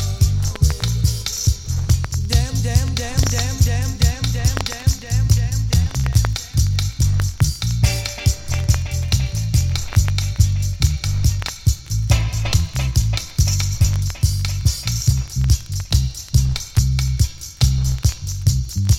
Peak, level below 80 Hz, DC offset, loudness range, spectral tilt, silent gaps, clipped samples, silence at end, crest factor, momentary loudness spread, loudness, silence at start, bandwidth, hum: -2 dBFS; -24 dBFS; under 0.1%; 1 LU; -4.5 dB/octave; none; under 0.1%; 0 s; 16 dB; 2 LU; -19 LUFS; 0 s; 16.5 kHz; none